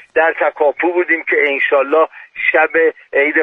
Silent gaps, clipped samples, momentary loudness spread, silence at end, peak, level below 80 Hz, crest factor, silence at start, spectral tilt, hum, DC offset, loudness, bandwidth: none; under 0.1%; 3 LU; 0 s; 0 dBFS; -64 dBFS; 14 dB; 0.15 s; -5 dB/octave; none; under 0.1%; -14 LUFS; 4 kHz